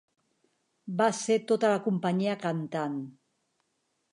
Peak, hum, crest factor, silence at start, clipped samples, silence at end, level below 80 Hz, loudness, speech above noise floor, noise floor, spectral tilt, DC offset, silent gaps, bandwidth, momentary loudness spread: -12 dBFS; none; 20 dB; 0.85 s; under 0.1%; 1 s; -82 dBFS; -29 LUFS; 49 dB; -77 dBFS; -5.5 dB/octave; under 0.1%; none; 11 kHz; 12 LU